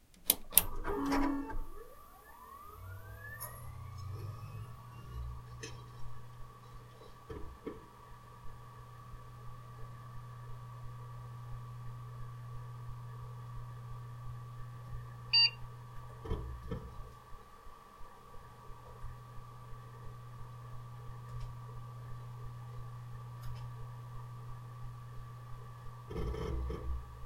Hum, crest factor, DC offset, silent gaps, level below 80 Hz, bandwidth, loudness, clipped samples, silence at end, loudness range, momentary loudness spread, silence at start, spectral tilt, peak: none; 38 dB; under 0.1%; none; -50 dBFS; 16.5 kHz; -39 LUFS; under 0.1%; 0 s; 17 LU; 20 LU; 0 s; -3.5 dB/octave; -2 dBFS